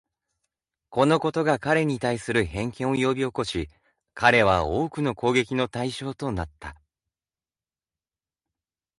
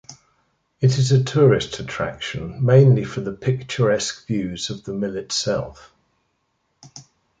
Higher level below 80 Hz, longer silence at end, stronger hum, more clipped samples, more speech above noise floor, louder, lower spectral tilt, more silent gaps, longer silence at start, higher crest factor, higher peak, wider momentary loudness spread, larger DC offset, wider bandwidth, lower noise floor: about the same, -48 dBFS vs -50 dBFS; first, 2.25 s vs 0.4 s; neither; neither; first, over 66 dB vs 51 dB; second, -24 LUFS vs -20 LUFS; about the same, -5.5 dB/octave vs -6 dB/octave; neither; first, 0.9 s vs 0.1 s; about the same, 22 dB vs 18 dB; about the same, -4 dBFS vs -2 dBFS; about the same, 12 LU vs 13 LU; neither; first, 11.5 kHz vs 9.2 kHz; first, under -90 dBFS vs -70 dBFS